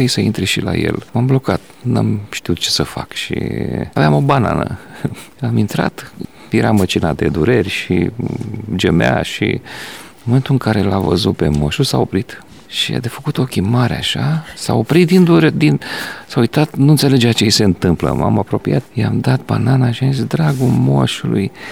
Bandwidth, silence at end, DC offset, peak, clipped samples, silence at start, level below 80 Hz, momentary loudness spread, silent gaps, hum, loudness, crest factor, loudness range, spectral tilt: 16.5 kHz; 0 s; 0.5%; 0 dBFS; under 0.1%; 0 s; -38 dBFS; 11 LU; none; none; -15 LUFS; 14 dB; 4 LU; -6 dB/octave